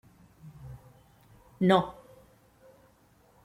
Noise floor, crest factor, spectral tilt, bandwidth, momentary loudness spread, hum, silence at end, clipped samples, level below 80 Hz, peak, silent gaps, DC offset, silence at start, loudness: -63 dBFS; 24 dB; -7.5 dB/octave; 13 kHz; 28 LU; none; 1.55 s; under 0.1%; -62 dBFS; -8 dBFS; none; under 0.1%; 0.45 s; -27 LUFS